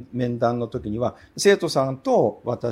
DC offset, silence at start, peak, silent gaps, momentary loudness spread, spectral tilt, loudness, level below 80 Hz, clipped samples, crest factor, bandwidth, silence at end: under 0.1%; 0 s; -6 dBFS; none; 9 LU; -5 dB/octave; -22 LUFS; -52 dBFS; under 0.1%; 16 dB; 16 kHz; 0 s